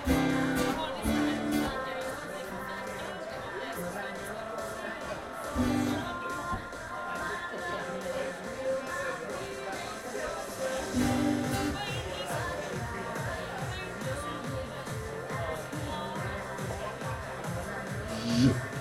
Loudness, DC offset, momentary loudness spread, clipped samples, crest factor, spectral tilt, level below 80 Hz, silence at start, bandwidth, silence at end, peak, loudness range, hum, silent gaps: -34 LUFS; under 0.1%; 9 LU; under 0.1%; 20 dB; -5 dB/octave; -48 dBFS; 0 s; 16 kHz; 0 s; -12 dBFS; 4 LU; none; none